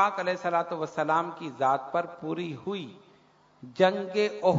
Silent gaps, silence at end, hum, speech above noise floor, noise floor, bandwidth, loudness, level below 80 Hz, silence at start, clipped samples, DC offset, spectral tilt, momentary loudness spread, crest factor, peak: none; 0 s; none; 33 dB; -60 dBFS; 7.8 kHz; -29 LUFS; -74 dBFS; 0 s; under 0.1%; under 0.1%; -6 dB/octave; 11 LU; 20 dB; -8 dBFS